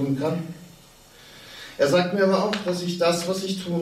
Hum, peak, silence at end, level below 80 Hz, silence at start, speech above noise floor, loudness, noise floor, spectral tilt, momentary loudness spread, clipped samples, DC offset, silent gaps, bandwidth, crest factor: none; -10 dBFS; 0 s; -62 dBFS; 0 s; 27 dB; -23 LUFS; -50 dBFS; -5 dB/octave; 20 LU; under 0.1%; under 0.1%; none; 16 kHz; 16 dB